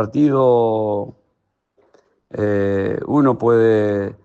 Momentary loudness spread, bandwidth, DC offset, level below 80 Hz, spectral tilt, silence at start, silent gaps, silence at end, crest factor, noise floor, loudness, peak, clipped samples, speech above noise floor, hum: 9 LU; 7.6 kHz; under 0.1%; -58 dBFS; -9.5 dB/octave; 0 s; none; 0.1 s; 14 dB; -71 dBFS; -17 LUFS; -4 dBFS; under 0.1%; 54 dB; none